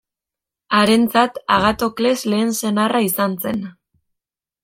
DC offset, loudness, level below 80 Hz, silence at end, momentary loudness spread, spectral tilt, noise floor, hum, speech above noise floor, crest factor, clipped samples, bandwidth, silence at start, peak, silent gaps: under 0.1%; -17 LUFS; -50 dBFS; 0.9 s; 9 LU; -4 dB/octave; -87 dBFS; none; 70 dB; 18 dB; under 0.1%; 16.5 kHz; 0.7 s; -2 dBFS; none